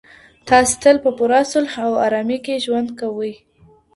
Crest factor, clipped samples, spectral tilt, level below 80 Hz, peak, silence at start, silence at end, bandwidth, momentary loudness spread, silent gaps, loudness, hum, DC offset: 18 dB; under 0.1%; -3 dB/octave; -50 dBFS; 0 dBFS; 0.45 s; 0.6 s; 11.5 kHz; 10 LU; none; -17 LUFS; none; under 0.1%